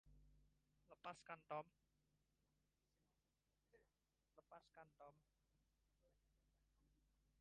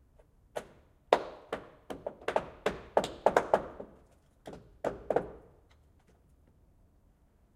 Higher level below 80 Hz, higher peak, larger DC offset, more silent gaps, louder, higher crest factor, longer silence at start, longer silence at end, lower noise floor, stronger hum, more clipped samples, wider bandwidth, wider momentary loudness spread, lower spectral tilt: second, -84 dBFS vs -60 dBFS; second, -40 dBFS vs -6 dBFS; neither; neither; second, -59 LUFS vs -34 LUFS; about the same, 26 dB vs 30 dB; second, 0.05 s vs 0.55 s; second, 0.5 s vs 2.15 s; first, -89 dBFS vs -65 dBFS; neither; neither; second, 5.2 kHz vs 15.5 kHz; second, 15 LU vs 21 LU; about the same, -3.5 dB/octave vs -4.5 dB/octave